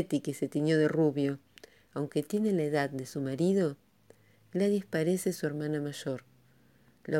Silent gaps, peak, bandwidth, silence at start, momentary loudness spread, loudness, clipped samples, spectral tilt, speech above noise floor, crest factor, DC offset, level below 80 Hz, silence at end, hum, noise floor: none; -16 dBFS; 17 kHz; 0 s; 11 LU; -31 LUFS; under 0.1%; -6.5 dB/octave; 34 dB; 16 dB; under 0.1%; -76 dBFS; 0 s; none; -64 dBFS